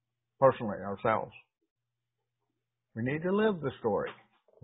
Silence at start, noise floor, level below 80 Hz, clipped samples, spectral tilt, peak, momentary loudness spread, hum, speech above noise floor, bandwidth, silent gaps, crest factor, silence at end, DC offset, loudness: 0.4 s; -87 dBFS; -66 dBFS; under 0.1%; -3.5 dB/octave; -8 dBFS; 12 LU; none; 57 dB; 3.9 kHz; 1.71-1.76 s; 24 dB; 0.5 s; under 0.1%; -31 LUFS